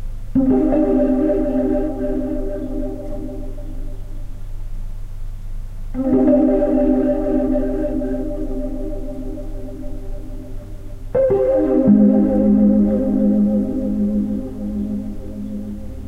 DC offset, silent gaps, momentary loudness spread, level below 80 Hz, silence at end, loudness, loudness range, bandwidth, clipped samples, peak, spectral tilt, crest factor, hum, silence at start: under 0.1%; none; 21 LU; -28 dBFS; 0 s; -18 LUFS; 12 LU; 4 kHz; under 0.1%; -2 dBFS; -10 dB/octave; 16 dB; none; 0 s